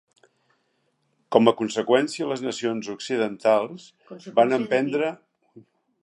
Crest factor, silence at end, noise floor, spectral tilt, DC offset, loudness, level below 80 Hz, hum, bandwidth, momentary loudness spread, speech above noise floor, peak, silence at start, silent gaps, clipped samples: 24 dB; 0.4 s; -71 dBFS; -5 dB/octave; under 0.1%; -23 LUFS; -76 dBFS; none; 11.5 kHz; 11 LU; 48 dB; -2 dBFS; 1.3 s; none; under 0.1%